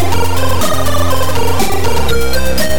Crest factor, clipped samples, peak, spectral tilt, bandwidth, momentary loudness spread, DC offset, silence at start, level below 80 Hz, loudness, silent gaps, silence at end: 10 dB; under 0.1%; 0 dBFS; -4 dB/octave; 17.5 kHz; 1 LU; 40%; 0 s; -24 dBFS; -15 LUFS; none; 0 s